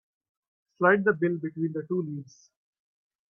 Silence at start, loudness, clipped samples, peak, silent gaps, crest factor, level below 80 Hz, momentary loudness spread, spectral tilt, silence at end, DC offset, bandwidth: 0.8 s; -27 LUFS; under 0.1%; -8 dBFS; none; 22 dB; -76 dBFS; 12 LU; -8.5 dB/octave; 1.05 s; under 0.1%; 6.8 kHz